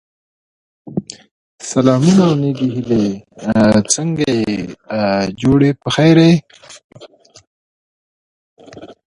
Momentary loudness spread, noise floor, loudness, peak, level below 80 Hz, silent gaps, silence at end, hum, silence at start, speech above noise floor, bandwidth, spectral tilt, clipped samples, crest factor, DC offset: 15 LU; under -90 dBFS; -14 LUFS; 0 dBFS; -46 dBFS; 1.31-1.58 s, 6.84-6.89 s, 7.47-8.57 s; 0.25 s; none; 0.85 s; over 76 dB; 11.5 kHz; -5.5 dB/octave; under 0.1%; 16 dB; under 0.1%